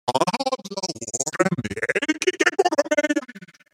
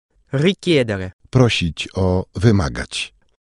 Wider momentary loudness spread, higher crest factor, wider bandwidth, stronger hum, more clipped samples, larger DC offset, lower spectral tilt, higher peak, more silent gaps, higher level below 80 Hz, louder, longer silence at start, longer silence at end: about the same, 8 LU vs 10 LU; about the same, 20 dB vs 18 dB; first, 16 kHz vs 11 kHz; neither; neither; neither; second, -3.5 dB/octave vs -6 dB/octave; about the same, -4 dBFS vs -2 dBFS; second, none vs 1.13-1.19 s; second, -60 dBFS vs -38 dBFS; second, -23 LUFS vs -19 LUFS; second, 0.05 s vs 0.35 s; about the same, 0.3 s vs 0.35 s